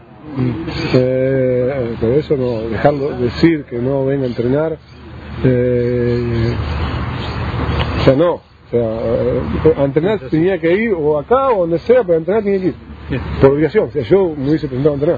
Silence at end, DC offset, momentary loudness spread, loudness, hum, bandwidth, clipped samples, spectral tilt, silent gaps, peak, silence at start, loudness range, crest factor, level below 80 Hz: 0 s; under 0.1%; 8 LU; -16 LUFS; none; 7.2 kHz; under 0.1%; -9 dB/octave; none; 0 dBFS; 0.1 s; 3 LU; 16 dB; -32 dBFS